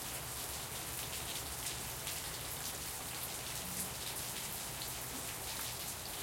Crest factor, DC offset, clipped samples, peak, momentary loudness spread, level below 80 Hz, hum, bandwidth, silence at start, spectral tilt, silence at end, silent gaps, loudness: 20 dB; under 0.1%; under 0.1%; -22 dBFS; 1 LU; -58 dBFS; none; 17 kHz; 0 s; -1.5 dB/octave; 0 s; none; -40 LUFS